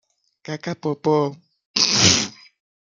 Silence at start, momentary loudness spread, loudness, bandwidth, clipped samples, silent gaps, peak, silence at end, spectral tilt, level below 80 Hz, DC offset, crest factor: 0.5 s; 16 LU; -19 LUFS; 11 kHz; under 0.1%; 1.65-1.74 s; -2 dBFS; 0.5 s; -2.5 dB/octave; -58 dBFS; under 0.1%; 22 dB